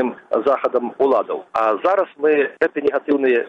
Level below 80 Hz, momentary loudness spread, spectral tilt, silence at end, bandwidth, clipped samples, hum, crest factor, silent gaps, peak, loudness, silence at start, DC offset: -64 dBFS; 4 LU; -6.5 dB/octave; 0 s; 6.4 kHz; under 0.1%; none; 14 dB; none; -4 dBFS; -19 LUFS; 0 s; under 0.1%